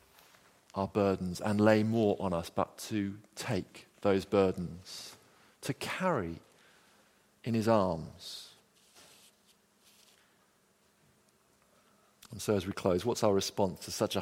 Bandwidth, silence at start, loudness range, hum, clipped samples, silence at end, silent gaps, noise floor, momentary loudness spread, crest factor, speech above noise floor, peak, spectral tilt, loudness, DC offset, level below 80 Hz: 16.5 kHz; 0.75 s; 8 LU; none; under 0.1%; 0 s; none; -69 dBFS; 16 LU; 24 dB; 38 dB; -10 dBFS; -5.5 dB/octave; -32 LUFS; under 0.1%; -64 dBFS